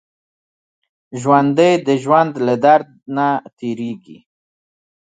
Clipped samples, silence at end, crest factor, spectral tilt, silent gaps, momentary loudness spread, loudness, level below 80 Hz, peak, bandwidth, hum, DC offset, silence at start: under 0.1%; 1 s; 18 dB; -6.5 dB/octave; 3.53-3.57 s; 13 LU; -16 LUFS; -68 dBFS; 0 dBFS; 9.4 kHz; none; under 0.1%; 1.1 s